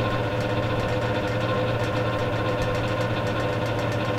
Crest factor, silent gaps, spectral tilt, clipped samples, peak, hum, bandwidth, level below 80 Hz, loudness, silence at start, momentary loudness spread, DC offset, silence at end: 12 dB; none; -6.5 dB/octave; under 0.1%; -12 dBFS; none; 14.5 kHz; -40 dBFS; -25 LUFS; 0 s; 1 LU; under 0.1%; 0 s